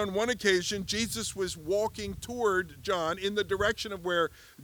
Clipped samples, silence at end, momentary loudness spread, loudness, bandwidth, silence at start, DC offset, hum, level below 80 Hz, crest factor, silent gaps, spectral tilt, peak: under 0.1%; 0 s; 7 LU; -30 LUFS; over 20 kHz; 0 s; under 0.1%; none; -54 dBFS; 20 dB; none; -3 dB/octave; -10 dBFS